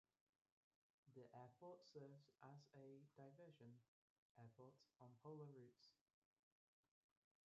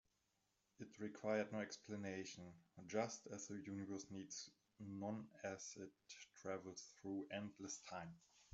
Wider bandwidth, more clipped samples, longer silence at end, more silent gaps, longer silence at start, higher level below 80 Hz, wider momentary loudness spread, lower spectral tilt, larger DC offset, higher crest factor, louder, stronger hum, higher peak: second, 7 kHz vs 8 kHz; neither; first, 1.55 s vs 0.05 s; first, 3.88-4.35 s vs none; first, 1.05 s vs 0.8 s; about the same, under -90 dBFS vs -86 dBFS; second, 7 LU vs 15 LU; first, -6.5 dB/octave vs -4.5 dB/octave; neither; about the same, 18 dB vs 22 dB; second, -65 LUFS vs -50 LUFS; neither; second, -50 dBFS vs -30 dBFS